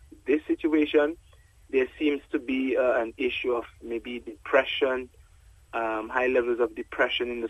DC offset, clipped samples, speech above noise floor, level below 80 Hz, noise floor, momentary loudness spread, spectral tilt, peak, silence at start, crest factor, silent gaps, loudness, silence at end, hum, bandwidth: under 0.1%; under 0.1%; 28 dB; -56 dBFS; -55 dBFS; 11 LU; -5 dB/octave; -8 dBFS; 0.25 s; 18 dB; none; -27 LUFS; 0 s; none; 11.5 kHz